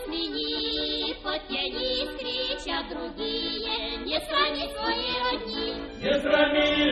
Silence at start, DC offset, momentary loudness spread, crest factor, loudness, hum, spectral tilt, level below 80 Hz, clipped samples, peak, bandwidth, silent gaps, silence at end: 0 s; under 0.1%; 9 LU; 20 dB; -27 LUFS; none; -4 dB/octave; -48 dBFS; under 0.1%; -8 dBFS; 11 kHz; none; 0 s